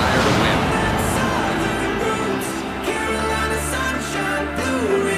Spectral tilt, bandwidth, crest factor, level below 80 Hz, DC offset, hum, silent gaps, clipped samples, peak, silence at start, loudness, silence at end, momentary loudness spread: -4.5 dB/octave; 15.5 kHz; 18 dB; -36 dBFS; under 0.1%; none; none; under 0.1%; -2 dBFS; 0 s; -20 LUFS; 0 s; 6 LU